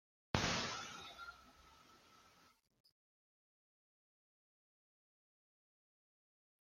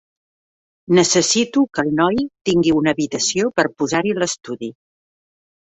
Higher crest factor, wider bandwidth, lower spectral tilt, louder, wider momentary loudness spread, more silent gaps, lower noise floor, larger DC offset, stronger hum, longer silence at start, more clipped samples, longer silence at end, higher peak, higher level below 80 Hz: first, 34 dB vs 18 dB; first, 16 kHz vs 8.2 kHz; about the same, -3 dB/octave vs -3.5 dB/octave; second, -42 LUFS vs -18 LUFS; first, 26 LU vs 8 LU; second, none vs 2.41-2.45 s; second, -70 dBFS vs under -90 dBFS; neither; neither; second, 0.35 s vs 0.9 s; neither; first, 4.45 s vs 1.1 s; second, -16 dBFS vs -2 dBFS; second, -68 dBFS vs -54 dBFS